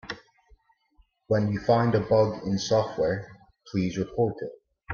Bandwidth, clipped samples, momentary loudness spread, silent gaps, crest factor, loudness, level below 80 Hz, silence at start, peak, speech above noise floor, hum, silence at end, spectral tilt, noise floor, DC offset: 7.2 kHz; under 0.1%; 16 LU; none; 18 dB; -26 LUFS; -56 dBFS; 0.05 s; -8 dBFS; 40 dB; none; 0 s; -6.5 dB/octave; -64 dBFS; under 0.1%